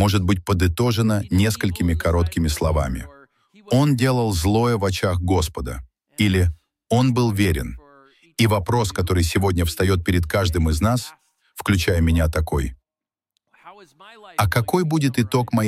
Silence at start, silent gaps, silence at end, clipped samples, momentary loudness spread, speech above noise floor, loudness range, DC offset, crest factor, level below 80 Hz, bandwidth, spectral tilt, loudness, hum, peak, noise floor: 0 s; none; 0 s; under 0.1%; 9 LU; 70 dB; 3 LU; under 0.1%; 16 dB; -32 dBFS; 15.5 kHz; -6 dB/octave; -20 LUFS; none; -4 dBFS; -89 dBFS